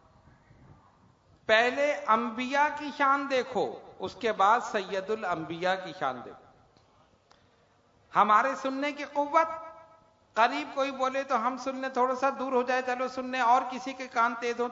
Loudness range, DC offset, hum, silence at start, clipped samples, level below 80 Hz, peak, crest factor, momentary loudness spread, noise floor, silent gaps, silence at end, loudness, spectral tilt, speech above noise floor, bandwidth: 3 LU; under 0.1%; none; 0.7 s; under 0.1%; -72 dBFS; -8 dBFS; 22 dB; 10 LU; -65 dBFS; none; 0 s; -28 LUFS; -4 dB/octave; 36 dB; 7.8 kHz